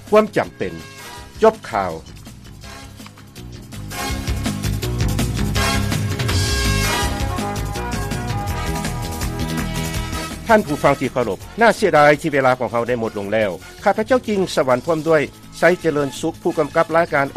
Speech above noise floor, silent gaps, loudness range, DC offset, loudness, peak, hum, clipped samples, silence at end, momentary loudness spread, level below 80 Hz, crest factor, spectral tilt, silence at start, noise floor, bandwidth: 21 dB; none; 8 LU; under 0.1%; -19 LUFS; -2 dBFS; none; under 0.1%; 0 s; 18 LU; -32 dBFS; 18 dB; -5 dB/octave; 0 s; -39 dBFS; 15.5 kHz